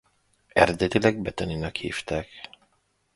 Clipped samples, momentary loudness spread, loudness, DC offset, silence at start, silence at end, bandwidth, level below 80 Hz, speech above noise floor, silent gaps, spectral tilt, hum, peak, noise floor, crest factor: under 0.1%; 18 LU; -25 LUFS; under 0.1%; 0.55 s; 0.7 s; 11.5 kHz; -46 dBFS; 45 dB; none; -5.5 dB/octave; none; 0 dBFS; -70 dBFS; 26 dB